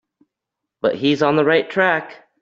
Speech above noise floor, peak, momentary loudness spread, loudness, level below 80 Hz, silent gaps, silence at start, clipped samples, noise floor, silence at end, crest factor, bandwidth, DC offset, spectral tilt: 65 dB; -2 dBFS; 7 LU; -18 LUFS; -64 dBFS; none; 0.85 s; under 0.1%; -82 dBFS; 0.25 s; 16 dB; 7.6 kHz; under 0.1%; -6 dB/octave